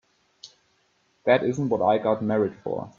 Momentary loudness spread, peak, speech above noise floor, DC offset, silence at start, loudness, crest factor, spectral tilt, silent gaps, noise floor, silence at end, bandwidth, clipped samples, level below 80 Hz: 7 LU; -6 dBFS; 44 dB; under 0.1%; 0.45 s; -24 LUFS; 20 dB; -7 dB/octave; none; -67 dBFS; 0.1 s; 7.4 kHz; under 0.1%; -64 dBFS